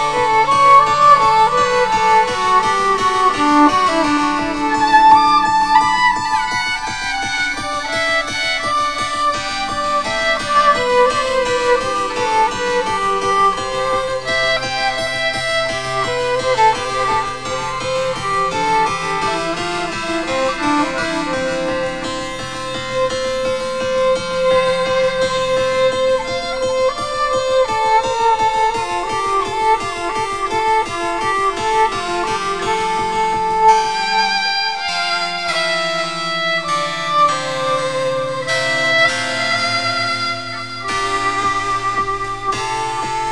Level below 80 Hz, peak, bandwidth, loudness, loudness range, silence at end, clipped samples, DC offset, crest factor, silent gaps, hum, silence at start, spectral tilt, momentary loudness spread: -40 dBFS; 0 dBFS; 10.5 kHz; -16 LUFS; 6 LU; 0 s; under 0.1%; 1%; 16 dB; none; none; 0 s; -3 dB/octave; 8 LU